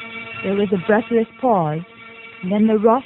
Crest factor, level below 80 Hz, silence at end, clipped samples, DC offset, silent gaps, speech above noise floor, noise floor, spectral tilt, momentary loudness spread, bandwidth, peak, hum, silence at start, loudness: 16 dB; -58 dBFS; 0 s; under 0.1%; under 0.1%; none; 22 dB; -39 dBFS; -9.5 dB/octave; 17 LU; 4.1 kHz; -2 dBFS; none; 0 s; -19 LUFS